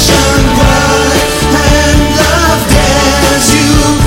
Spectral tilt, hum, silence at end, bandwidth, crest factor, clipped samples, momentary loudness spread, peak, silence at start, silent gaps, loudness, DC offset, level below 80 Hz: -4 dB/octave; none; 0 s; 17 kHz; 8 dB; 0.9%; 2 LU; 0 dBFS; 0 s; none; -7 LUFS; under 0.1%; -14 dBFS